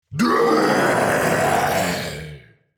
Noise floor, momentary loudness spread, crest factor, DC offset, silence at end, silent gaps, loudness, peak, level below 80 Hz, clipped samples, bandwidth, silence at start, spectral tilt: -42 dBFS; 13 LU; 14 dB; under 0.1%; 0.4 s; none; -18 LUFS; -6 dBFS; -50 dBFS; under 0.1%; 18.5 kHz; 0.1 s; -4.5 dB/octave